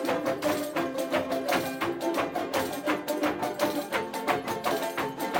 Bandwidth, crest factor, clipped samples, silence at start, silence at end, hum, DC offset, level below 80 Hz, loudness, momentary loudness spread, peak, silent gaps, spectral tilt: 17 kHz; 20 dB; under 0.1%; 0 s; 0 s; none; under 0.1%; -64 dBFS; -29 LUFS; 2 LU; -10 dBFS; none; -4 dB/octave